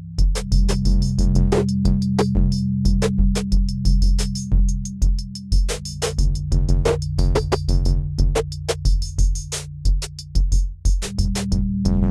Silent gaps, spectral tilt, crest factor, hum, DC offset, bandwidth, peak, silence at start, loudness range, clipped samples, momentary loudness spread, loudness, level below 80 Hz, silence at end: none; -6 dB/octave; 14 dB; none; under 0.1%; 12 kHz; -4 dBFS; 0 s; 3 LU; under 0.1%; 5 LU; -21 LUFS; -20 dBFS; 0 s